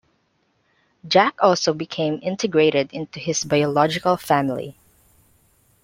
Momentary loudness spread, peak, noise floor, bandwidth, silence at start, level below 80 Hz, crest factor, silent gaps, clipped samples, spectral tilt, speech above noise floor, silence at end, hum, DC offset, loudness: 9 LU; -2 dBFS; -67 dBFS; 16.5 kHz; 1.05 s; -62 dBFS; 20 dB; none; under 0.1%; -4.5 dB/octave; 47 dB; 1.15 s; none; under 0.1%; -20 LUFS